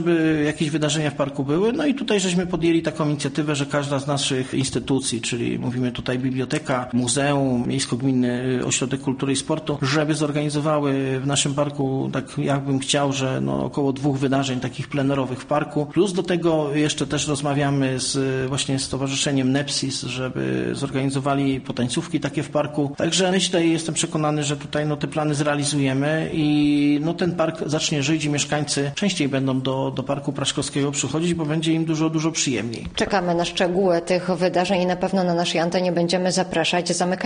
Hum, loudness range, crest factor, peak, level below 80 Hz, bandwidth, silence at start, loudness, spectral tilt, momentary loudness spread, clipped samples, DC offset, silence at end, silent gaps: none; 2 LU; 16 dB; -6 dBFS; -50 dBFS; 10 kHz; 0 s; -22 LUFS; -4.5 dB/octave; 4 LU; under 0.1%; under 0.1%; 0 s; none